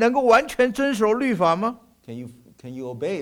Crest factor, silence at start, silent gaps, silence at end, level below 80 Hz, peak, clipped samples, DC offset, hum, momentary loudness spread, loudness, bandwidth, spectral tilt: 16 dB; 0 s; none; 0 s; -56 dBFS; -6 dBFS; under 0.1%; under 0.1%; none; 21 LU; -20 LUFS; 17 kHz; -5.5 dB/octave